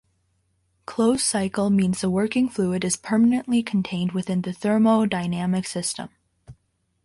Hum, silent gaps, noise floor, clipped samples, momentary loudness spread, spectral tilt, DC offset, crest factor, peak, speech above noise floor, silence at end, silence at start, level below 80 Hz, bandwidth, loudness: none; none; -69 dBFS; under 0.1%; 8 LU; -5 dB/octave; under 0.1%; 14 dB; -8 dBFS; 47 dB; 0.55 s; 0.9 s; -58 dBFS; 11.5 kHz; -22 LUFS